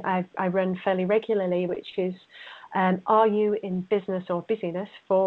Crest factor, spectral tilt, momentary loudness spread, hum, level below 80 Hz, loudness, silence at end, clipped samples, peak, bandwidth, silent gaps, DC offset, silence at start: 16 dB; -9.5 dB/octave; 11 LU; none; -70 dBFS; -26 LUFS; 0 s; under 0.1%; -8 dBFS; 4.5 kHz; none; under 0.1%; 0 s